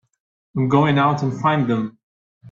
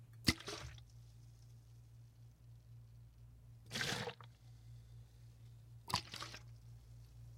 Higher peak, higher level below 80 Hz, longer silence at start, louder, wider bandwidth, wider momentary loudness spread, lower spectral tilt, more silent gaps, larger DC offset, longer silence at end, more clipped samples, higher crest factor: first, -2 dBFS vs -16 dBFS; about the same, -58 dBFS vs -62 dBFS; first, 0.55 s vs 0 s; first, -19 LUFS vs -43 LUFS; second, 7.4 kHz vs 16 kHz; second, 11 LU vs 21 LU; first, -8 dB/octave vs -3.5 dB/octave; first, 2.03-2.41 s vs none; neither; about the same, 0 s vs 0 s; neither; second, 18 dB vs 34 dB